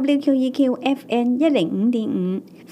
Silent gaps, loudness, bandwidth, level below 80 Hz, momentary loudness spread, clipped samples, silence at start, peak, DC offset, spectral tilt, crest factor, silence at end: none; -20 LUFS; 11.5 kHz; -74 dBFS; 5 LU; under 0.1%; 0 s; -4 dBFS; under 0.1%; -7 dB/octave; 14 dB; 0 s